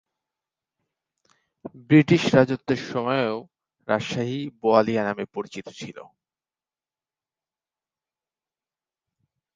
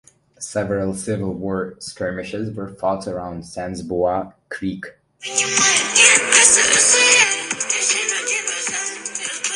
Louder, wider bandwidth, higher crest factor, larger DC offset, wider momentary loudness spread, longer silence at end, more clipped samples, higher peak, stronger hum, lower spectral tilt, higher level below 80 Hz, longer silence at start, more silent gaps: second, -22 LUFS vs -16 LUFS; second, 7.6 kHz vs 12 kHz; about the same, 24 dB vs 20 dB; neither; about the same, 21 LU vs 19 LU; first, 3.55 s vs 0 s; neither; about the same, -2 dBFS vs 0 dBFS; neither; first, -6.5 dB/octave vs -1 dB/octave; second, -64 dBFS vs -50 dBFS; first, 1.65 s vs 0.4 s; neither